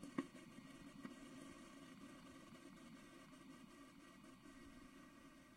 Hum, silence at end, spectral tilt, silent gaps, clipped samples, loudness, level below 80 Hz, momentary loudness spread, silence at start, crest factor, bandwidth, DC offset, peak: none; 0 s; -4.5 dB/octave; none; under 0.1%; -59 LUFS; -76 dBFS; 6 LU; 0 s; 30 dB; 16 kHz; under 0.1%; -28 dBFS